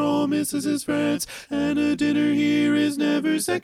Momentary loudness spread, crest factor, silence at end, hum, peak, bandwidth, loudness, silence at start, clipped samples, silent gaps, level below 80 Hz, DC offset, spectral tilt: 5 LU; 12 dB; 0.05 s; none; -10 dBFS; 15 kHz; -22 LUFS; 0 s; under 0.1%; none; -58 dBFS; under 0.1%; -4.5 dB/octave